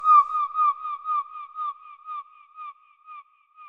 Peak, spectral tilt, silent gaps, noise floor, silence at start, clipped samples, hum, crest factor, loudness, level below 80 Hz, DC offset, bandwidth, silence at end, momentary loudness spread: -8 dBFS; 0 dB/octave; none; -49 dBFS; 0 s; under 0.1%; none; 18 dB; -24 LUFS; -80 dBFS; under 0.1%; 5.2 kHz; 0 s; 25 LU